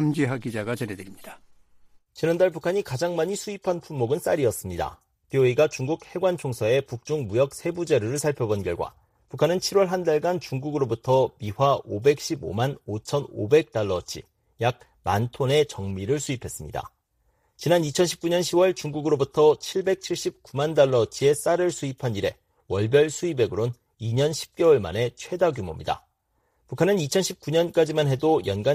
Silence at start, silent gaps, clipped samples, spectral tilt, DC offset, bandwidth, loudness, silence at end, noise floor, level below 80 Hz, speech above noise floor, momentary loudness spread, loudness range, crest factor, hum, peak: 0 s; none; under 0.1%; -5.5 dB/octave; under 0.1%; 15.5 kHz; -24 LUFS; 0 s; -71 dBFS; -56 dBFS; 47 dB; 10 LU; 4 LU; 18 dB; none; -6 dBFS